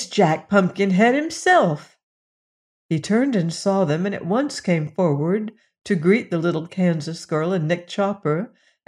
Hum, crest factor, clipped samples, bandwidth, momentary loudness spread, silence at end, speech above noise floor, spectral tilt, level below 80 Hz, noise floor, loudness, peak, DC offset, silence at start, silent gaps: none; 18 dB; under 0.1%; 11 kHz; 8 LU; 0.4 s; over 70 dB; -6 dB/octave; -66 dBFS; under -90 dBFS; -21 LUFS; -4 dBFS; under 0.1%; 0 s; 2.03-2.89 s